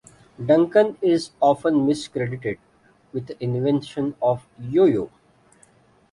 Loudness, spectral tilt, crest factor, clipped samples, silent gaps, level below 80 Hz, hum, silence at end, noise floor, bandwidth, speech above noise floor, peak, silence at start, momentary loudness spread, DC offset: -22 LUFS; -7 dB/octave; 18 dB; under 0.1%; none; -60 dBFS; none; 1.05 s; -56 dBFS; 11 kHz; 36 dB; -4 dBFS; 0.4 s; 14 LU; under 0.1%